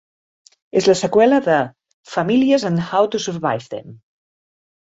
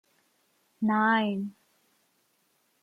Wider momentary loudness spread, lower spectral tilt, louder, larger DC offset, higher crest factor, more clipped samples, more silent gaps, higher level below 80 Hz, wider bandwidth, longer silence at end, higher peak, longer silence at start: about the same, 12 LU vs 12 LU; second, -5.5 dB/octave vs -7 dB/octave; first, -17 LUFS vs -27 LUFS; neither; about the same, 16 dB vs 18 dB; neither; first, 1.94-2.04 s vs none; first, -60 dBFS vs -78 dBFS; first, 8 kHz vs 4.8 kHz; second, 0.9 s vs 1.3 s; first, -2 dBFS vs -12 dBFS; about the same, 0.75 s vs 0.8 s